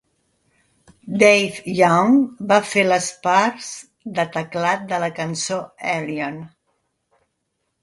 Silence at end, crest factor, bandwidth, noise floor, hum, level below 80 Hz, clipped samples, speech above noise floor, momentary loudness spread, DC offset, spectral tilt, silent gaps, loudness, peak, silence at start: 1.35 s; 20 dB; 11.5 kHz; -74 dBFS; none; -62 dBFS; under 0.1%; 55 dB; 15 LU; under 0.1%; -4.5 dB/octave; none; -19 LUFS; 0 dBFS; 1.05 s